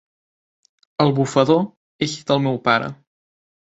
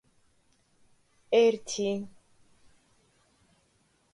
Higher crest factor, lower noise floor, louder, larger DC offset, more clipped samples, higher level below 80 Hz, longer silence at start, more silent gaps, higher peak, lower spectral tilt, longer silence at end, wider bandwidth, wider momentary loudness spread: about the same, 20 dB vs 20 dB; first, under -90 dBFS vs -69 dBFS; first, -19 LUFS vs -27 LUFS; neither; neither; first, -60 dBFS vs -72 dBFS; second, 1 s vs 1.3 s; first, 1.77-1.99 s vs none; first, -2 dBFS vs -12 dBFS; first, -6 dB/octave vs -4 dB/octave; second, 0.75 s vs 2.05 s; second, 8 kHz vs 11 kHz; about the same, 12 LU vs 13 LU